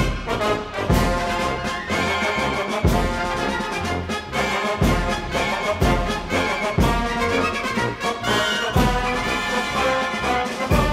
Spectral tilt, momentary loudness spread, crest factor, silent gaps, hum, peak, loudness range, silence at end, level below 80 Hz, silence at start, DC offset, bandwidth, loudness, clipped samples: -5 dB/octave; 4 LU; 16 dB; none; none; -4 dBFS; 1 LU; 0 s; -30 dBFS; 0 s; under 0.1%; 16 kHz; -21 LUFS; under 0.1%